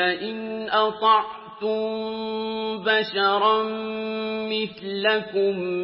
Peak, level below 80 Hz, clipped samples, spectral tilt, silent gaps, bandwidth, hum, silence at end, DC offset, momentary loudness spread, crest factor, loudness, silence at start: -6 dBFS; -68 dBFS; under 0.1%; -8.5 dB/octave; none; 5.8 kHz; none; 0 s; under 0.1%; 9 LU; 18 dB; -24 LUFS; 0 s